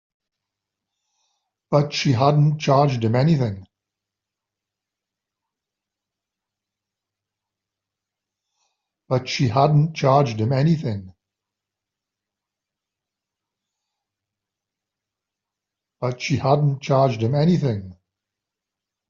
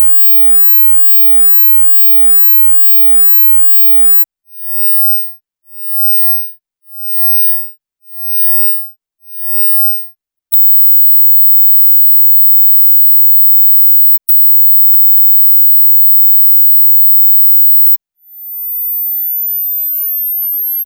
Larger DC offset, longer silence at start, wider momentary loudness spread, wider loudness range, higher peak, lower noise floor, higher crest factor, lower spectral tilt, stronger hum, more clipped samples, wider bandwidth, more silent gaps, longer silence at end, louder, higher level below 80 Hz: neither; first, 1.7 s vs 0 s; about the same, 9 LU vs 11 LU; first, 10 LU vs 7 LU; second, -4 dBFS vs 0 dBFS; first, -86 dBFS vs -34 dBFS; first, 20 dB vs 8 dB; first, -6.5 dB/octave vs 2 dB/octave; neither; neither; second, 7.2 kHz vs 19.5 kHz; neither; first, 1.15 s vs 0 s; second, -20 LUFS vs -3 LUFS; first, -60 dBFS vs under -90 dBFS